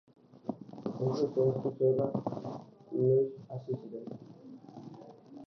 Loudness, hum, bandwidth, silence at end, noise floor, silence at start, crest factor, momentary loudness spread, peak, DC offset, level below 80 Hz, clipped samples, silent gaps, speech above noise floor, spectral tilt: -33 LUFS; none; 6.2 kHz; 0 s; -51 dBFS; 0.45 s; 18 dB; 21 LU; -16 dBFS; under 0.1%; -74 dBFS; under 0.1%; none; 20 dB; -10 dB/octave